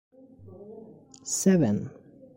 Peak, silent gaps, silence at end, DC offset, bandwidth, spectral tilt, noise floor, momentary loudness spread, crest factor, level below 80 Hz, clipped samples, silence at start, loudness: -10 dBFS; none; 0.45 s; under 0.1%; 16.5 kHz; -5.5 dB/octave; -49 dBFS; 25 LU; 18 dB; -62 dBFS; under 0.1%; 0.4 s; -25 LUFS